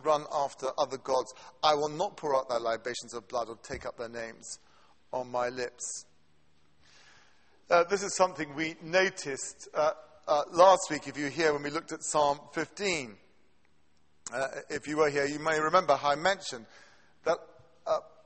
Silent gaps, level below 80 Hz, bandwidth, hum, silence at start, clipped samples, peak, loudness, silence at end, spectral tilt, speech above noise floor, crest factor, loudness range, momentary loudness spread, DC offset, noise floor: none; -66 dBFS; 8.8 kHz; none; 0.05 s; under 0.1%; -8 dBFS; -30 LUFS; 0.15 s; -3 dB/octave; 41 dB; 22 dB; 10 LU; 14 LU; under 0.1%; -71 dBFS